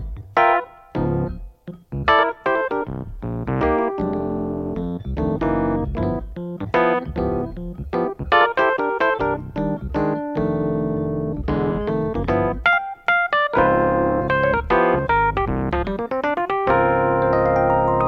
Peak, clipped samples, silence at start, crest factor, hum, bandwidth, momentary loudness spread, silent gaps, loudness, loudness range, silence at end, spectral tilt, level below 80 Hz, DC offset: -4 dBFS; under 0.1%; 0 s; 16 dB; none; 6.4 kHz; 10 LU; none; -21 LUFS; 4 LU; 0 s; -8.5 dB/octave; -36 dBFS; under 0.1%